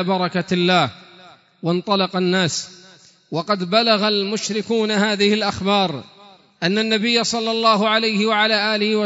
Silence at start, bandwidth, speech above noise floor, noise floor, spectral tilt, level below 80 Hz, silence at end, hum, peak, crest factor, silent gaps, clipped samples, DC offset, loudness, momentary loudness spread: 0 s; 8 kHz; 30 dB; -49 dBFS; -4 dB/octave; -60 dBFS; 0 s; none; -2 dBFS; 18 dB; none; under 0.1%; under 0.1%; -18 LUFS; 8 LU